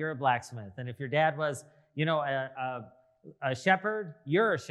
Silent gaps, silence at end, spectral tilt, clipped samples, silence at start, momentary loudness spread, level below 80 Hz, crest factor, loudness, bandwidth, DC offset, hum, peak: none; 0 s; -5.5 dB/octave; under 0.1%; 0 s; 14 LU; -80 dBFS; 22 dB; -30 LUFS; 12.5 kHz; under 0.1%; none; -10 dBFS